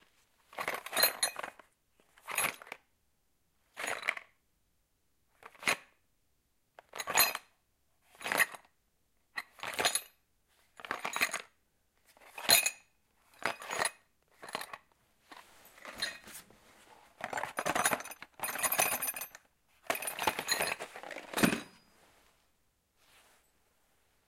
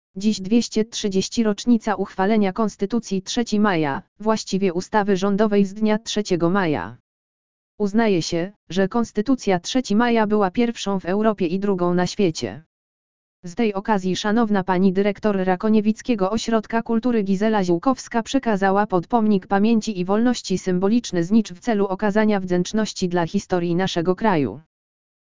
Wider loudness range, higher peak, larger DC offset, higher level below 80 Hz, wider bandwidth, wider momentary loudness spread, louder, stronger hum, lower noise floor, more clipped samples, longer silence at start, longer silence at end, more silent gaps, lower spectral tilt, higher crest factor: first, 8 LU vs 3 LU; second, -8 dBFS vs -4 dBFS; second, under 0.1% vs 2%; second, -72 dBFS vs -52 dBFS; first, 16.5 kHz vs 7.6 kHz; first, 22 LU vs 5 LU; second, -33 LUFS vs -21 LUFS; neither; second, -77 dBFS vs under -90 dBFS; neither; first, 0.5 s vs 0.15 s; first, 2.6 s vs 0.7 s; second, none vs 4.08-4.16 s, 7.00-7.78 s, 8.56-8.67 s, 12.66-13.43 s; second, -1 dB/octave vs -5.5 dB/octave; first, 30 dB vs 16 dB